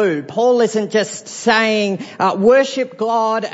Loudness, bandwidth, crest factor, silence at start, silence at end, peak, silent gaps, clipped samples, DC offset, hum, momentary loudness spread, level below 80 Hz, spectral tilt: -16 LUFS; 8 kHz; 14 dB; 0 s; 0 s; -2 dBFS; none; under 0.1%; under 0.1%; none; 8 LU; -62 dBFS; -4 dB/octave